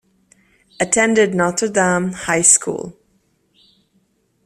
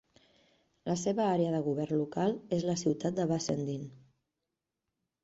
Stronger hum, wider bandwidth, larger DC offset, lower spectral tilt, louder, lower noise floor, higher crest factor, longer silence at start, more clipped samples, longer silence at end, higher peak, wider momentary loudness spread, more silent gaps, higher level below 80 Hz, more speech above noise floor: neither; first, 15 kHz vs 8 kHz; neither; second, -3 dB/octave vs -6 dB/octave; first, -15 LUFS vs -32 LUFS; second, -62 dBFS vs -87 dBFS; about the same, 20 dB vs 16 dB; about the same, 0.8 s vs 0.85 s; neither; first, 1.55 s vs 1.25 s; first, 0 dBFS vs -18 dBFS; first, 14 LU vs 8 LU; neither; first, -56 dBFS vs -70 dBFS; second, 46 dB vs 56 dB